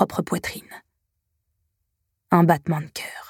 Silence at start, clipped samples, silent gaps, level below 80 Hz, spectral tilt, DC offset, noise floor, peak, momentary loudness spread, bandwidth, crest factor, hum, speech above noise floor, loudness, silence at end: 0 s; under 0.1%; none; -58 dBFS; -6.5 dB/octave; under 0.1%; -76 dBFS; -2 dBFS; 15 LU; 17 kHz; 24 dB; none; 54 dB; -22 LUFS; 0.05 s